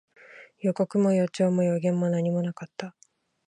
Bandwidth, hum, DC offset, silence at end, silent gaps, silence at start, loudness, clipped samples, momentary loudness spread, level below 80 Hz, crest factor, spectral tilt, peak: 10.5 kHz; none; under 0.1%; 0.6 s; none; 0.35 s; -25 LUFS; under 0.1%; 15 LU; -74 dBFS; 14 dB; -8 dB/octave; -12 dBFS